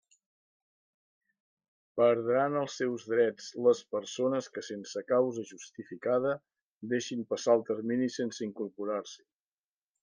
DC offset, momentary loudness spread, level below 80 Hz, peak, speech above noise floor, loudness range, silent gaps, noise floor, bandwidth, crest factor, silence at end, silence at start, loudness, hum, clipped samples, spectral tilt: under 0.1%; 12 LU; -84 dBFS; -14 dBFS; over 59 dB; 3 LU; 6.61-6.81 s; under -90 dBFS; 10 kHz; 20 dB; 0.85 s; 1.95 s; -31 LUFS; none; under 0.1%; -5 dB/octave